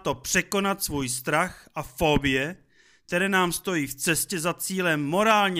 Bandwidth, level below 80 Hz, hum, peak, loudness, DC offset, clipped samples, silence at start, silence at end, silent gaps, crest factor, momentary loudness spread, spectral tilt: 16 kHz; -48 dBFS; none; -8 dBFS; -25 LUFS; under 0.1%; under 0.1%; 0.05 s; 0 s; none; 18 dB; 7 LU; -3.5 dB/octave